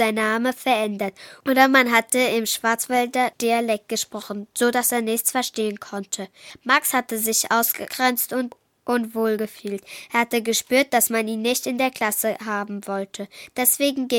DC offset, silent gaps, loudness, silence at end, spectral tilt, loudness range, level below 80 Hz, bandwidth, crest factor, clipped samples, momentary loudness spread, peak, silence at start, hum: under 0.1%; none; -21 LUFS; 0 s; -2 dB/octave; 3 LU; -68 dBFS; 19 kHz; 22 dB; under 0.1%; 12 LU; -2 dBFS; 0 s; none